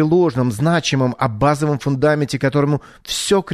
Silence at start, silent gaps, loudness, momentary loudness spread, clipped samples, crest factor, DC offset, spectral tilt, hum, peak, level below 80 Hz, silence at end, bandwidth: 0 s; none; -18 LUFS; 4 LU; under 0.1%; 14 dB; under 0.1%; -5.5 dB/octave; none; -4 dBFS; -46 dBFS; 0 s; 13.5 kHz